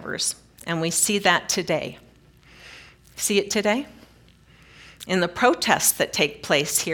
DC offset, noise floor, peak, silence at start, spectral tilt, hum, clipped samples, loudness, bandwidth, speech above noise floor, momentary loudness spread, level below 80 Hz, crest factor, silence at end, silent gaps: under 0.1%; -53 dBFS; -2 dBFS; 0 s; -2.5 dB/octave; none; under 0.1%; -22 LUFS; 18 kHz; 31 dB; 17 LU; -58 dBFS; 24 dB; 0 s; none